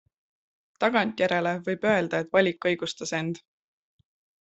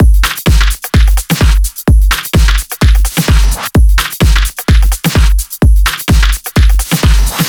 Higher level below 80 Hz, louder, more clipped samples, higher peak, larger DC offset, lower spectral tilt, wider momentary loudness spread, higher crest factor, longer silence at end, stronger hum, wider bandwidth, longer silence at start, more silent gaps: second, -68 dBFS vs -10 dBFS; second, -26 LUFS vs -11 LUFS; neither; second, -8 dBFS vs 0 dBFS; neither; about the same, -5 dB/octave vs -4.5 dB/octave; first, 7 LU vs 2 LU; first, 20 dB vs 8 dB; first, 1.05 s vs 0 s; neither; second, 8.2 kHz vs 20 kHz; first, 0.8 s vs 0 s; neither